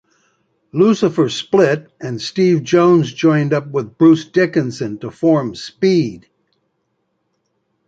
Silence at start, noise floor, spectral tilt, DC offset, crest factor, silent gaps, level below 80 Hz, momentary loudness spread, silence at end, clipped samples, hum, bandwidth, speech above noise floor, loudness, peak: 0.75 s; -68 dBFS; -6.5 dB/octave; under 0.1%; 14 dB; none; -58 dBFS; 12 LU; 1.7 s; under 0.1%; none; 7.8 kHz; 54 dB; -15 LUFS; -2 dBFS